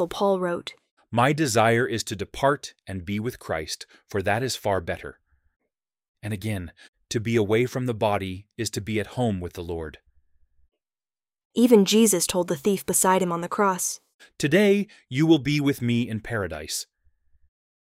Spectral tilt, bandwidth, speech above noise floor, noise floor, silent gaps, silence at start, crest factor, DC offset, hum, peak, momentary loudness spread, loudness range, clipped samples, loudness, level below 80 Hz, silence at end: -4.5 dB/octave; 16 kHz; over 66 dB; under -90 dBFS; 0.91-0.97 s, 6.08-6.15 s, 6.88-6.93 s, 11.45-11.50 s, 14.14-14.19 s; 0 s; 22 dB; under 0.1%; none; -4 dBFS; 14 LU; 8 LU; under 0.1%; -24 LUFS; -54 dBFS; 1 s